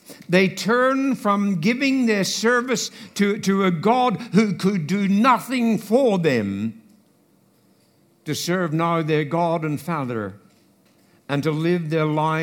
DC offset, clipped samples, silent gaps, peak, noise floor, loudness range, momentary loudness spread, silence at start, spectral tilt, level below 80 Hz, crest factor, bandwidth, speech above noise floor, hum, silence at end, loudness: under 0.1%; under 0.1%; none; -2 dBFS; -59 dBFS; 5 LU; 8 LU; 0.1 s; -5.5 dB/octave; -70 dBFS; 18 dB; 17.5 kHz; 39 dB; none; 0 s; -21 LUFS